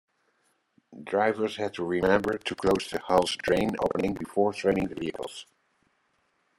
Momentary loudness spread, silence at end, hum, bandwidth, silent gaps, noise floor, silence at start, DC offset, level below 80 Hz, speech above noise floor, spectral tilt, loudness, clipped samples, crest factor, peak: 10 LU; 1.15 s; none; 16 kHz; none; -72 dBFS; 0.9 s; under 0.1%; -56 dBFS; 45 dB; -5 dB/octave; -27 LUFS; under 0.1%; 22 dB; -6 dBFS